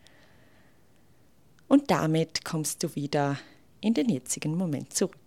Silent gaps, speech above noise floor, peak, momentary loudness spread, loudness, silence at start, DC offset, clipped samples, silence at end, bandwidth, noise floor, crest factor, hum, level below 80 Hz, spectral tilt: none; 35 dB; -10 dBFS; 7 LU; -28 LUFS; 1.7 s; 0.1%; under 0.1%; 0.15 s; 16.5 kHz; -62 dBFS; 20 dB; none; -68 dBFS; -5 dB/octave